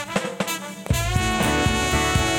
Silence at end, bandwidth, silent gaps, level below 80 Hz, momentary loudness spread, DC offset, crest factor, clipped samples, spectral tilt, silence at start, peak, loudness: 0 s; 17.5 kHz; none; -32 dBFS; 7 LU; under 0.1%; 14 dB; under 0.1%; -4 dB/octave; 0 s; -8 dBFS; -22 LUFS